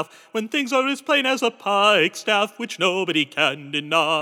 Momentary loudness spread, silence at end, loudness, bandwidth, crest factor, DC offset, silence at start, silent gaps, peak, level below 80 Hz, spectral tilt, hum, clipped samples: 8 LU; 0 s; -20 LUFS; 18 kHz; 18 dB; under 0.1%; 0 s; none; -4 dBFS; under -90 dBFS; -3 dB/octave; none; under 0.1%